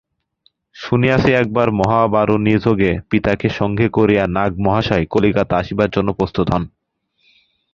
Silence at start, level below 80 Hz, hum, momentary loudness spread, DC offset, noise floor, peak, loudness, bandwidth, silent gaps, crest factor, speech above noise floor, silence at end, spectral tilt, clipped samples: 0.75 s; -38 dBFS; none; 5 LU; under 0.1%; -65 dBFS; 0 dBFS; -16 LUFS; 7.4 kHz; none; 16 dB; 50 dB; 1.05 s; -8 dB/octave; under 0.1%